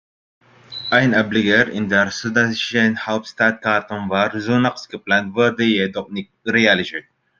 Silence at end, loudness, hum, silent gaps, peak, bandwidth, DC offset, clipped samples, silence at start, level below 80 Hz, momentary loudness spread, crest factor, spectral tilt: 0.4 s; -18 LUFS; none; none; 0 dBFS; 7.4 kHz; under 0.1%; under 0.1%; 0.7 s; -60 dBFS; 12 LU; 18 dB; -5 dB/octave